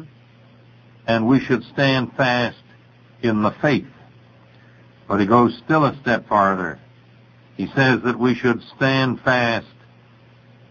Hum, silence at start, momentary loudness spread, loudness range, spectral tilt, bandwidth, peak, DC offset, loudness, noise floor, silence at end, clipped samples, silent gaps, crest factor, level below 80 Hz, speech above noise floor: none; 0 s; 8 LU; 2 LU; -7 dB/octave; 7 kHz; -4 dBFS; under 0.1%; -19 LUFS; -50 dBFS; 1.05 s; under 0.1%; none; 18 dB; -56 dBFS; 31 dB